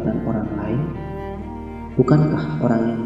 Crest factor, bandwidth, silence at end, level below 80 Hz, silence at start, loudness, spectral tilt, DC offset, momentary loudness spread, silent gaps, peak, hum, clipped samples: 20 dB; 7.8 kHz; 0 s; -40 dBFS; 0 s; -21 LUFS; -10 dB/octave; under 0.1%; 15 LU; none; -2 dBFS; none; under 0.1%